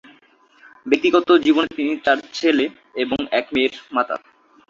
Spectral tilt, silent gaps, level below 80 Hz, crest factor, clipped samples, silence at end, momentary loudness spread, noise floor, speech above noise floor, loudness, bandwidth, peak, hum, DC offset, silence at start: -4 dB/octave; none; -58 dBFS; 18 dB; under 0.1%; 0.5 s; 11 LU; -54 dBFS; 35 dB; -19 LUFS; 7.6 kHz; -2 dBFS; none; under 0.1%; 0.85 s